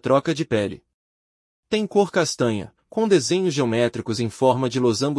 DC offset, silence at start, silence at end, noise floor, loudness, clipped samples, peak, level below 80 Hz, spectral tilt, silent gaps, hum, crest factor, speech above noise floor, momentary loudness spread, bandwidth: under 0.1%; 0.05 s; 0 s; under -90 dBFS; -22 LUFS; under 0.1%; -4 dBFS; -62 dBFS; -5 dB/octave; 0.94-1.63 s; none; 16 dB; over 69 dB; 7 LU; 12 kHz